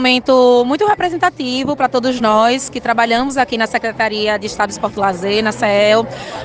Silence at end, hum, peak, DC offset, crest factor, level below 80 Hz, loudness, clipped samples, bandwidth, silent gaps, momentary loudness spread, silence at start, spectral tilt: 0 s; none; 0 dBFS; under 0.1%; 14 dB; -48 dBFS; -15 LUFS; under 0.1%; 9.8 kHz; none; 7 LU; 0 s; -4 dB/octave